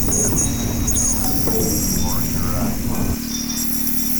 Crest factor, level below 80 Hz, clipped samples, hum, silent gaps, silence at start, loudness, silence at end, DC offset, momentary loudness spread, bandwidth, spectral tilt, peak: 14 dB; -28 dBFS; under 0.1%; none; none; 0 s; -18 LUFS; 0 s; under 0.1%; 6 LU; over 20 kHz; -3.5 dB/octave; -6 dBFS